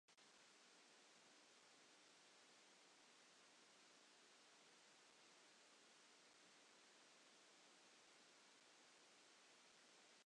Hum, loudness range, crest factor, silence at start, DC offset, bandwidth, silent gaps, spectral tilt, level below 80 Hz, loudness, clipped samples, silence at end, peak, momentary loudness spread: none; 0 LU; 14 dB; 0.1 s; under 0.1%; 10 kHz; none; -0.5 dB/octave; under -90 dBFS; -69 LUFS; under 0.1%; 0 s; -58 dBFS; 0 LU